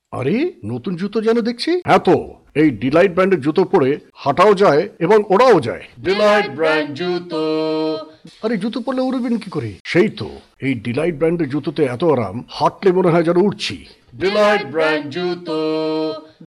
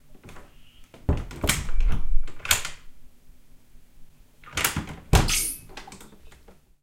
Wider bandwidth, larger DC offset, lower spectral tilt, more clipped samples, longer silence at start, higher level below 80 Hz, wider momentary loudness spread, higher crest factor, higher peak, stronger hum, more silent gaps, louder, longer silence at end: second, 12 kHz vs 17 kHz; neither; first, -6.5 dB/octave vs -3 dB/octave; neither; about the same, 0.1 s vs 0.1 s; second, -52 dBFS vs -30 dBFS; second, 11 LU vs 24 LU; second, 14 dB vs 24 dB; about the same, -2 dBFS vs -2 dBFS; neither; first, 9.80-9.85 s vs none; first, -17 LUFS vs -26 LUFS; second, 0 s vs 0.8 s